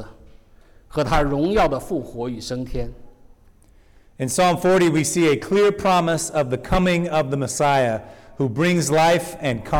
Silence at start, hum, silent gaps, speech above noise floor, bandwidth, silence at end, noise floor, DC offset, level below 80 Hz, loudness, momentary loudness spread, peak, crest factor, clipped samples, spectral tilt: 0 s; none; none; 32 dB; 18 kHz; 0 s; -51 dBFS; under 0.1%; -36 dBFS; -20 LUFS; 12 LU; -12 dBFS; 10 dB; under 0.1%; -5 dB/octave